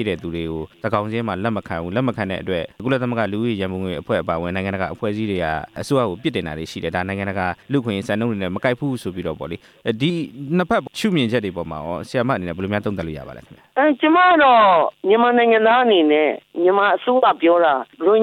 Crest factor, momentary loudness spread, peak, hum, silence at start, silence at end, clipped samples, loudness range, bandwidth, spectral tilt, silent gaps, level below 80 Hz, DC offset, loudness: 16 dB; 13 LU; -4 dBFS; none; 0 s; 0 s; under 0.1%; 8 LU; 15 kHz; -6.5 dB/octave; none; -50 dBFS; under 0.1%; -19 LUFS